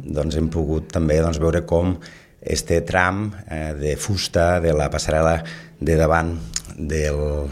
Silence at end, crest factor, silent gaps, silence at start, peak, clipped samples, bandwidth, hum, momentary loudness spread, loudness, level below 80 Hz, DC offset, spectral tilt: 0 s; 20 dB; none; 0 s; 0 dBFS; under 0.1%; 14.5 kHz; none; 10 LU; -21 LUFS; -32 dBFS; under 0.1%; -5.5 dB/octave